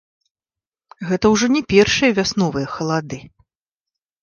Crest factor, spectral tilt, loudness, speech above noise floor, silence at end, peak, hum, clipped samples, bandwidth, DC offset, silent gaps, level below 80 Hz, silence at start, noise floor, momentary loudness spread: 20 dB; -4.5 dB/octave; -17 LUFS; over 73 dB; 0.95 s; 0 dBFS; none; under 0.1%; 10 kHz; under 0.1%; none; -46 dBFS; 1 s; under -90 dBFS; 15 LU